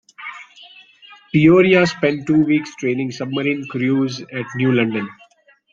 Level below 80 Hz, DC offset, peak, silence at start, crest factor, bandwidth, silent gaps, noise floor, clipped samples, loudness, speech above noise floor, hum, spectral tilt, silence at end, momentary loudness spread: -56 dBFS; under 0.1%; 0 dBFS; 0.2 s; 18 dB; 7.6 kHz; none; -53 dBFS; under 0.1%; -17 LUFS; 36 dB; none; -6.5 dB/octave; 0.6 s; 18 LU